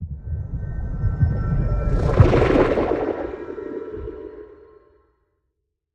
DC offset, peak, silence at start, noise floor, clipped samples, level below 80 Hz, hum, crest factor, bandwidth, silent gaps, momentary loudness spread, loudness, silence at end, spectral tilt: under 0.1%; 0 dBFS; 0 s; -76 dBFS; under 0.1%; -28 dBFS; none; 22 dB; 8.2 kHz; none; 17 LU; -22 LUFS; 1.3 s; -9 dB/octave